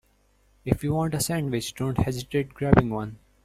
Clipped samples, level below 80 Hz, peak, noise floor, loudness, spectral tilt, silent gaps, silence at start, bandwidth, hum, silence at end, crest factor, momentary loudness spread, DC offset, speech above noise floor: under 0.1%; -42 dBFS; -2 dBFS; -63 dBFS; -26 LUFS; -6 dB/octave; none; 0.65 s; 16 kHz; none; 0.3 s; 24 dB; 10 LU; under 0.1%; 39 dB